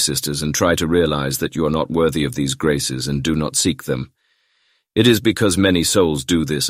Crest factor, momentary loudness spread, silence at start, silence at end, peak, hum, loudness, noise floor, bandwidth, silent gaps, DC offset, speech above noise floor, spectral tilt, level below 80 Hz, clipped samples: 18 dB; 6 LU; 0 s; 0 s; -2 dBFS; none; -18 LUFS; -64 dBFS; 16 kHz; none; under 0.1%; 46 dB; -4 dB/octave; -40 dBFS; under 0.1%